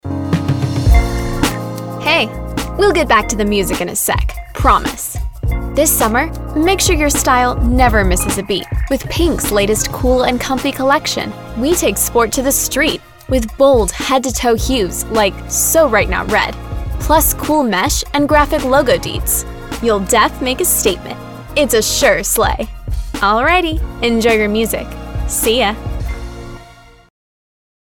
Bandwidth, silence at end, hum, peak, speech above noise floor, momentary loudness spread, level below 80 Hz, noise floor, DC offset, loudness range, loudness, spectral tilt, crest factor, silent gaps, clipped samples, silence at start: 19.5 kHz; 1.1 s; none; 0 dBFS; 26 dB; 11 LU; -24 dBFS; -40 dBFS; under 0.1%; 2 LU; -14 LUFS; -3.5 dB/octave; 14 dB; none; under 0.1%; 0.05 s